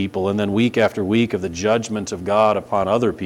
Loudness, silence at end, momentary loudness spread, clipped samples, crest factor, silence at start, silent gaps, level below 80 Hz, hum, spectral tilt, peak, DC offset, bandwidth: -19 LUFS; 0 s; 5 LU; under 0.1%; 14 dB; 0 s; none; -52 dBFS; none; -5.5 dB/octave; -4 dBFS; under 0.1%; 14 kHz